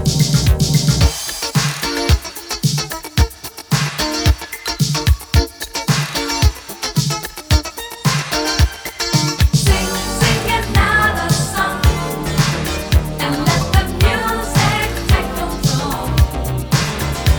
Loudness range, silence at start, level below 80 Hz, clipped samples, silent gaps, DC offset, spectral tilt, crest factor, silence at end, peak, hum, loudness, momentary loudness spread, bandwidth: 3 LU; 0 s; -22 dBFS; under 0.1%; none; under 0.1%; -4 dB/octave; 16 dB; 0 s; 0 dBFS; none; -17 LUFS; 6 LU; over 20 kHz